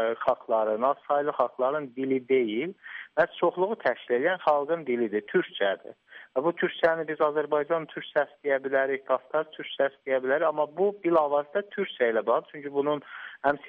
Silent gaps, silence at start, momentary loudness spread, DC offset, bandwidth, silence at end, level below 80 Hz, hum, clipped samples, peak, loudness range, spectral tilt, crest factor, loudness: none; 0 s; 6 LU; under 0.1%; 5.6 kHz; 0 s; -72 dBFS; none; under 0.1%; -10 dBFS; 1 LU; -3 dB/octave; 16 dB; -27 LUFS